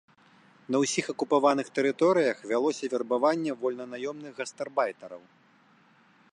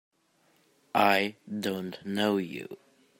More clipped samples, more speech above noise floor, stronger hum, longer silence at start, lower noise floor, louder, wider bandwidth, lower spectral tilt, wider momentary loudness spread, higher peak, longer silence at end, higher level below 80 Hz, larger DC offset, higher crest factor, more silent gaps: neither; second, 34 dB vs 39 dB; neither; second, 0.7 s vs 0.95 s; second, -61 dBFS vs -68 dBFS; about the same, -28 LUFS vs -29 LUFS; second, 11.5 kHz vs 16.5 kHz; about the same, -4 dB/octave vs -5 dB/octave; second, 13 LU vs 17 LU; about the same, -10 dBFS vs -8 dBFS; first, 1.15 s vs 0.45 s; about the same, -80 dBFS vs -76 dBFS; neither; about the same, 20 dB vs 22 dB; neither